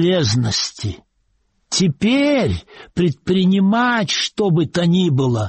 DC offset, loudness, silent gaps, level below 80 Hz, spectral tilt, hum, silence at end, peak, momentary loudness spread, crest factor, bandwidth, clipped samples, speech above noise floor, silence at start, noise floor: under 0.1%; -17 LUFS; none; -46 dBFS; -5 dB/octave; none; 0 s; -6 dBFS; 10 LU; 10 dB; 8.8 kHz; under 0.1%; 48 dB; 0 s; -65 dBFS